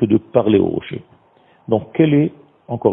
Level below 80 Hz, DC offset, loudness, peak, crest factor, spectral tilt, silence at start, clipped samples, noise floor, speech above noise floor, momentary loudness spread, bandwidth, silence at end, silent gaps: -54 dBFS; under 0.1%; -17 LUFS; 0 dBFS; 18 dB; -12.5 dB/octave; 0 s; under 0.1%; -53 dBFS; 37 dB; 15 LU; 3.8 kHz; 0 s; none